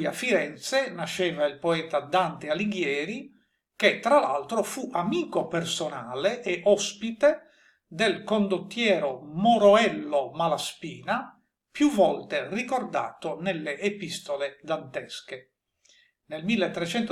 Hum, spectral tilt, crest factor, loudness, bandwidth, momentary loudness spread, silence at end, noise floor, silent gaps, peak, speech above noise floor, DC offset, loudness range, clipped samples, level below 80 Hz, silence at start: none; -4.5 dB/octave; 20 dB; -26 LUFS; 15 kHz; 12 LU; 0 s; -63 dBFS; none; -6 dBFS; 37 dB; under 0.1%; 8 LU; under 0.1%; -70 dBFS; 0 s